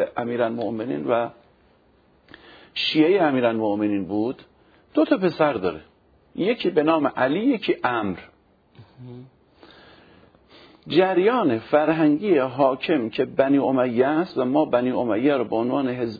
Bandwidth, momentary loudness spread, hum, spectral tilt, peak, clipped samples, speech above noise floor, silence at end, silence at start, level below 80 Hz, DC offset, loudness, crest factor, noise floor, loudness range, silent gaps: 5 kHz; 9 LU; none; -8 dB/octave; -6 dBFS; under 0.1%; 37 dB; 0 s; 0 s; -64 dBFS; under 0.1%; -22 LUFS; 18 dB; -59 dBFS; 6 LU; none